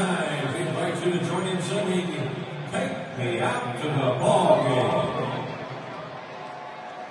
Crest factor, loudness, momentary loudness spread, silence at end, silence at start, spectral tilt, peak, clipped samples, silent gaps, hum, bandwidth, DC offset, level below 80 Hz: 20 dB; -26 LUFS; 16 LU; 0 s; 0 s; -5.5 dB/octave; -6 dBFS; under 0.1%; none; none; 11.5 kHz; under 0.1%; -66 dBFS